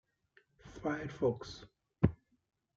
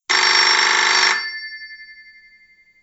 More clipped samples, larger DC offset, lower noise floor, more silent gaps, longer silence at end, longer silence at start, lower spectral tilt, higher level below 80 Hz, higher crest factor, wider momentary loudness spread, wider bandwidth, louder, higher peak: neither; neither; first, -71 dBFS vs -52 dBFS; neither; second, 0.6 s vs 0.9 s; first, 0.65 s vs 0.1 s; first, -7.5 dB/octave vs 2.5 dB/octave; first, -56 dBFS vs -72 dBFS; first, 26 dB vs 18 dB; second, 17 LU vs 20 LU; about the same, 7.6 kHz vs 8.2 kHz; second, -37 LUFS vs -14 LUFS; second, -12 dBFS vs 0 dBFS